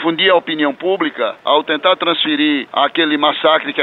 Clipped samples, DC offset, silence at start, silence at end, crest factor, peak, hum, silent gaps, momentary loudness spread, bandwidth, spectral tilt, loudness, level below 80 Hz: under 0.1%; under 0.1%; 0 s; 0 s; 14 dB; -2 dBFS; none; none; 5 LU; 4.4 kHz; -6 dB/octave; -15 LUFS; -68 dBFS